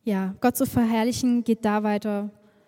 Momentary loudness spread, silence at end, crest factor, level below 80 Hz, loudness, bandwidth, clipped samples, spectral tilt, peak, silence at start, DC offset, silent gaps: 7 LU; 0.4 s; 16 dB; -56 dBFS; -24 LUFS; 17 kHz; under 0.1%; -5.5 dB/octave; -8 dBFS; 0.05 s; under 0.1%; none